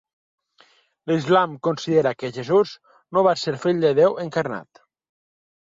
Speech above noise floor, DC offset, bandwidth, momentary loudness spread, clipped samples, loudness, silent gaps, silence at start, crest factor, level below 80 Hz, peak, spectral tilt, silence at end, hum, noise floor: 38 dB; under 0.1%; 7.8 kHz; 10 LU; under 0.1%; -21 LUFS; none; 1.05 s; 18 dB; -66 dBFS; -6 dBFS; -6 dB/octave; 1.1 s; none; -58 dBFS